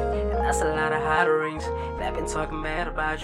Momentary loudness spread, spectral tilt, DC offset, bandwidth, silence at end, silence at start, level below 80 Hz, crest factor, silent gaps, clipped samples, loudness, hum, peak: 8 LU; -5 dB/octave; under 0.1%; 15.5 kHz; 0 s; 0 s; -34 dBFS; 18 dB; none; under 0.1%; -26 LUFS; none; -6 dBFS